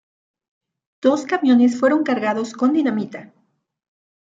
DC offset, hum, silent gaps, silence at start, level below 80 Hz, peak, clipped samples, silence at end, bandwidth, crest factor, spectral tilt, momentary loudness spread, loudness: under 0.1%; none; none; 1.05 s; -74 dBFS; -4 dBFS; under 0.1%; 1 s; 7.8 kHz; 16 dB; -5.5 dB/octave; 10 LU; -18 LUFS